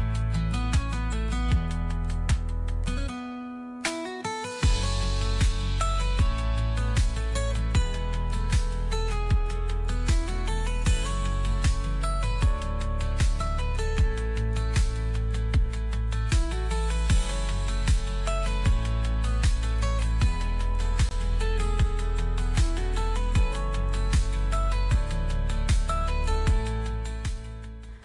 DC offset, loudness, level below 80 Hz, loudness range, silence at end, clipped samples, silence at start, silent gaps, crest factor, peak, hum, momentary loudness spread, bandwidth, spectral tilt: under 0.1%; -28 LUFS; -26 dBFS; 2 LU; 0.05 s; under 0.1%; 0 s; none; 10 dB; -14 dBFS; none; 5 LU; 11.5 kHz; -5 dB/octave